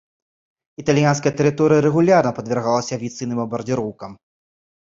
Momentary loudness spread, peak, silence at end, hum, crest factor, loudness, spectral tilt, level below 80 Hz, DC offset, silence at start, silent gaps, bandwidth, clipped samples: 12 LU; -2 dBFS; 0.7 s; none; 18 dB; -19 LUFS; -6.5 dB/octave; -56 dBFS; under 0.1%; 0.8 s; none; 7.8 kHz; under 0.1%